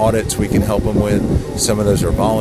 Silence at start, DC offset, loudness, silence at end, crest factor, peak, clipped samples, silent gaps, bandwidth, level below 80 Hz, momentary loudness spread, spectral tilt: 0 s; under 0.1%; -16 LUFS; 0 s; 14 dB; -2 dBFS; under 0.1%; none; 15.5 kHz; -26 dBFS; 2 LU; -5.5 dB/octave